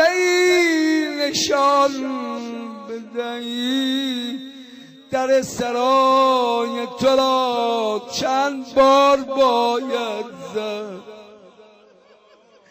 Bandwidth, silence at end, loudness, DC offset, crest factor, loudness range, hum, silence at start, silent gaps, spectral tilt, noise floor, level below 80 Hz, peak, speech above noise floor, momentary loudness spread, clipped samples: 15.5 kHz; 1.35 s; -19 LUFS; under 0.1%; 14 dB; 6 LU; none; 0 s; none; -3 dB/octave; -52 dBFS; -60 dBFS; -6 dBFS; 34 dB; 15 LU; under 0.1%